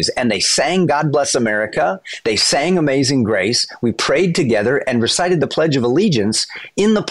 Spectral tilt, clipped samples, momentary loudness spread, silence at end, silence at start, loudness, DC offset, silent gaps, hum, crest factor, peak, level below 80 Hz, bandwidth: -4 dB/octave; under 0.1%; 5 LU; 0 s; 0 s; -16 LUFS; under 0.1%; none; none; 10 dB; -6 dBFS; -50 dBFS; 12 kHz